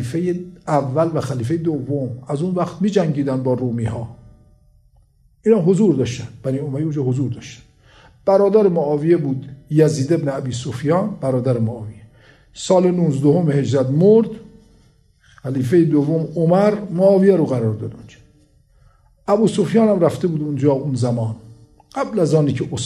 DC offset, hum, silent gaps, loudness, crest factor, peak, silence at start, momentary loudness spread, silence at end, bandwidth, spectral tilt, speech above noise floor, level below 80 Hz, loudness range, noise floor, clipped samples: under 0.1%; none; none; -18 LUFS; 16 dB; -2 dBFS; 0 s; 12 LU; 0 s; 12 kHz; -7.5 dB/octave; 37 dB; -52 dBFS; 4 LU; -54 dBFS; under 0.1%